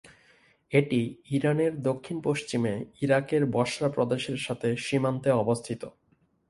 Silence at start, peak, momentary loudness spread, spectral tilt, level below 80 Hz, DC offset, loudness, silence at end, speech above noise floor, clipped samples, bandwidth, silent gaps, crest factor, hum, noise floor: 0.05 s; -8 dBFS; 6 LU; -6 dB/octave; -64 dBFS; under 0.1%; -28 LUFS; 0.6 s; 41 dB; under 0.1%; 11.5 kHz; none; 20 dB; none; -68 dBFS